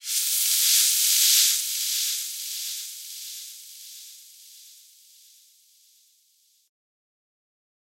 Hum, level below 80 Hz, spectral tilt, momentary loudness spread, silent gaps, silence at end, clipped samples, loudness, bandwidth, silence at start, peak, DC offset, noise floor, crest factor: none; under -90 dBFS; 11.5 dB/octave; 24 LU; none; 3.3 s; under 0.1%; -20 LUFS; 16 kHz; 0.05 s; -6 dBFS; under 0.1%; -64 dBFS; 22 dB